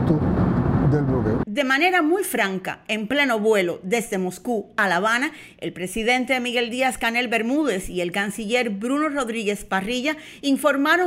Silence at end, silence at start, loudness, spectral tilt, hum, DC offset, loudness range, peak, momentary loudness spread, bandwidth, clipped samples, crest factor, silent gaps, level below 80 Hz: 0 s; 0 s; -22 LUFS; -5 dB/octave; none; under 0.1%; 2 LU; -6 dBFS; 8 LU; 16 kHz; under 0.1%; 14 dB; none; -42 dBFS